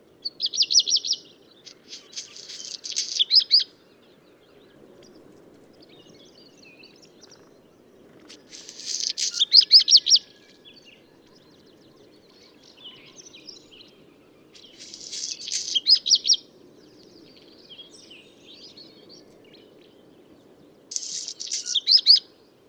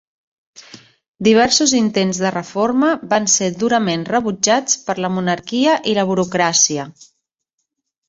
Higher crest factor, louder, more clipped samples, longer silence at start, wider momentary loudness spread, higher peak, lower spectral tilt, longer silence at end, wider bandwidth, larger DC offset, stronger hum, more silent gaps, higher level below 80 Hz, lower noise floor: first, 24 dB vs 18 dB; about the same, -18 LUFS vs -16 LUFS; neither; second, 0.25 s vs 0.75 s; first, 26 LU vs 7 LU; about the same, -2 dBFS vs 0 dBFS; second, 2 dB/octave vs -3 dB/octave; second, 0.5 s vs 1.2 s; first, 18.5 kHz vs 8 kHz; neither; neither; second, none vs 1.08-1.14 s; second, -78 dBFS vs -58 dBFS; second, -55 dBFS vs -76 dBFS